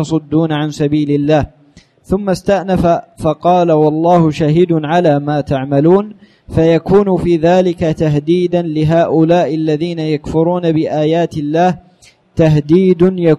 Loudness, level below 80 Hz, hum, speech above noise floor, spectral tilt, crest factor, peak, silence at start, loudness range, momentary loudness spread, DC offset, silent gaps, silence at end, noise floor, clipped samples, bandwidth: -13 LUFS; -38 dBFS; none; 34 dB; -8 dB/octave; 12 dB; 0 dBFS; 0 s; 3 LU; 6 LU; under 0.1%; none; 0 s; -46 dBFS; under 0.1%; 11.5 kHz